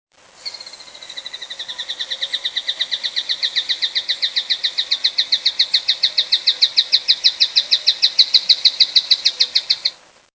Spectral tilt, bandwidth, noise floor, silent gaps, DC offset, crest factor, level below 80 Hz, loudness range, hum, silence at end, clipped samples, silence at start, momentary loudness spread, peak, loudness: 3 dB/octave; 8 kHz; -37 dBFS; none; under 0.1%; 18 dB; -70 dBFS; 9 LU; none; 0.4 s; under 0.1%; 0.4 s; 18 LU; -2 dBFS; -15 LUFS